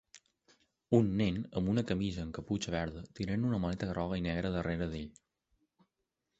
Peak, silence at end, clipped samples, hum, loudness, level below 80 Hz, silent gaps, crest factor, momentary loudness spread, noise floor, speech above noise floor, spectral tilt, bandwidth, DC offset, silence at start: -12 dBFS; 1.3 s; under 0.1%; none; -35 LUFS; -52 dBFS; none; 22 dB; 10 LU; -86 dBFS; 52 dB; -7 dB/octave; 8.2 kHz; under 0.1%; 0.15 s